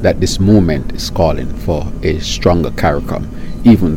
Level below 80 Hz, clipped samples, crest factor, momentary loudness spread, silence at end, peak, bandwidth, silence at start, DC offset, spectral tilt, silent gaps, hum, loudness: -24 dBFS; 0.3%; 12 dB; 10 LU; 0 s; 0 dBFS; 16.5 kHz; 0 s; under 0.1%; -6.5 dB/octave; none; none; -14 LUFS